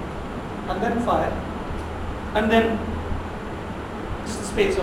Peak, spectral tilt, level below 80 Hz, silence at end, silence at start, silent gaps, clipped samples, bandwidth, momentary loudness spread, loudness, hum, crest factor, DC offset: -6 dBFS; -5.5 dB/octave; -36 dBFS; 0 s; 0 s; none; under 0.1%; 16 kHz; 12 LU; -26 LUFS; none; 18 dB; under 0.1%